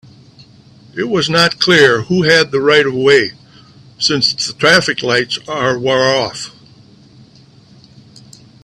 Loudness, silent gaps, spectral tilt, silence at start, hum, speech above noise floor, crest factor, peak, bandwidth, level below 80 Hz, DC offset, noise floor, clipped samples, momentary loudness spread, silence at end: -12 LUFS; none; -3.5 dB/octave; 0.95 s; none; 31 dB; 16 dB; 0 dBFS; 13.5 kHz; -52 dBFS; under 0.1%; -44 dBFS; under 0.1%; 11 LU; 2.15 s